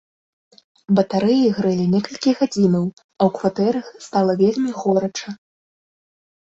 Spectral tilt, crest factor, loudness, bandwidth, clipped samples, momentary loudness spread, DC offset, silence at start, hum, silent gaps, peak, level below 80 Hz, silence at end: -7 dB/octave; 18 dB; -19 LUFS; 7.8 kHz; under 0.1%; 10 LU; under 0.1%; 0.9 s; none; 3.04-3.09 s; -2 dBFS; -60 dBFS; 1.15 s